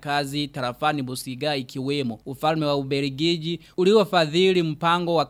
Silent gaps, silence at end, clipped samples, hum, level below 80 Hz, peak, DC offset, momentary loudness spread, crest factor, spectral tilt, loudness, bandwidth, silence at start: none; 0 s; under 0.1%; none; -58 dBFS; -6 dBFS; under 0.1%; 9 LU; 18 dB; -5.5 dB/octave; -23 LUFS; 16 kHz; 0 s